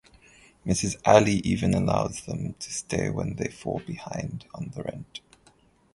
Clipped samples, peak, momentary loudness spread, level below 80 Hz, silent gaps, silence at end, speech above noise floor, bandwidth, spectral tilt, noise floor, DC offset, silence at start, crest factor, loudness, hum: under 0.1%; -2 dBFS; 18 LU; -48 dBFS; none; 0.75 s; 34 dB; 11.5 kHz; -5.5 dB/octave; -60 dBFS; under 0.1%; 0.65 s; 26 dB; -27 LUFS; none